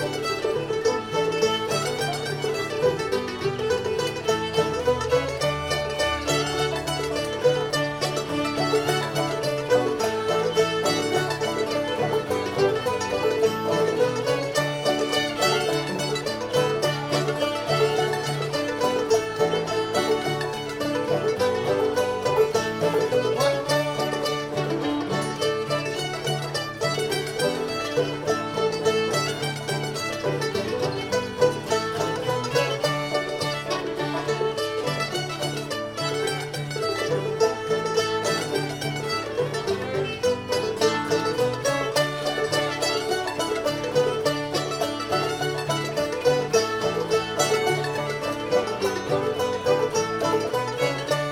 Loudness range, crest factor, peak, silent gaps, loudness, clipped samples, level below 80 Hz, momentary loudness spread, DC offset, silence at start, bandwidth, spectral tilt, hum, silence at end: 2 LU; 18 dB; -8 dBFS; none; -24 LUFS; under 0.1%; -54 dBFS; 5 LU; under 0.1%; 0 s; 17 kHz; -4 dB/octave; none; 0 s